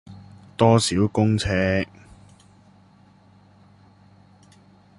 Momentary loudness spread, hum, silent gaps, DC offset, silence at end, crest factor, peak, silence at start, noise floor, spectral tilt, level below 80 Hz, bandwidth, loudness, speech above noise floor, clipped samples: 18 LU; none; none; under 0.1%; 3.15 s; 22 dB; -2 dBFS; 0.1 s; -54 dBFS; -5.5 dB/octave; -46 dBFS; 11.5 kHz; -21 LUFS; 34 dB; under 0.1%